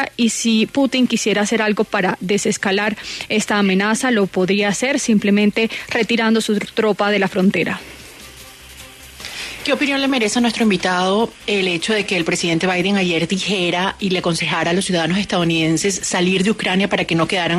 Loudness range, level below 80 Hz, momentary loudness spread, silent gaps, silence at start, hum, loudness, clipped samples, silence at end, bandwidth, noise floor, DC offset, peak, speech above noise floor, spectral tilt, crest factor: 3 LU; -50 dBFS; 8 LU; none; 0 s; none; -17 LUFS; under 0.1%; 0 s; 13.5 kHz; -39 dBFS; under 0.1%; -4 dBFS; 22 dB; -4 dB/octave; 14 dB